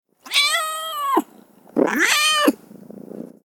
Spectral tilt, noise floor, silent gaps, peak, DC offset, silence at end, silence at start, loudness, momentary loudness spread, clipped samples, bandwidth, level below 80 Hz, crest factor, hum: -1 dB/octave; -49 dBFS; none; -2 dBFS; under 0.1%; 0.2 s; 0.25 s; -19 LUFS; 22 LU; under 0.1%; 19 kHz; -74 dBFS; 20 dB; none